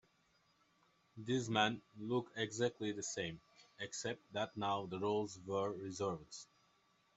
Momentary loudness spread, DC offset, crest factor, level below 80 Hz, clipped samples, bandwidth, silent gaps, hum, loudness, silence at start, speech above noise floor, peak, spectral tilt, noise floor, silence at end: 13 LU; under 0.1%; 24 dB; -78 dBFS; under 0.1%; 8.2 kHz; none; none; -41 LUFS; 1.15 s; 35 dB; -18 dBFS; -4 dB/octave; -76 dBFS; 0.75 s